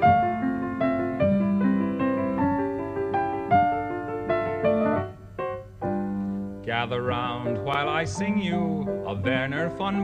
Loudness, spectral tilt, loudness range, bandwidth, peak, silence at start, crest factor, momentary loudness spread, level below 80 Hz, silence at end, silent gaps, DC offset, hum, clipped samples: -26 LUFS; -7 dB/octave; 3 LU; 9.2 kHz; -8 dBFS; 0 s; 18 dB; 8 LU; -52 dBFS; 0 s; none; under 0.1%; none; under 0.1%